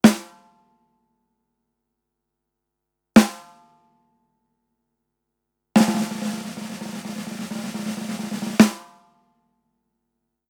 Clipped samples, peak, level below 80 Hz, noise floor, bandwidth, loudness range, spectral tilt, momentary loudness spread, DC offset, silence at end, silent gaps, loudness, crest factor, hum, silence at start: under 0.1%; 0 dBFS; -58 dBFS; -81 dBFS; 19 kHz; 3 LU; -5 dB/octave; 16 LU; under 0.1%; 1.65 s; none; -22 LUFS; 24 dB; 50 Hz at -55 dBFS; 0.05 s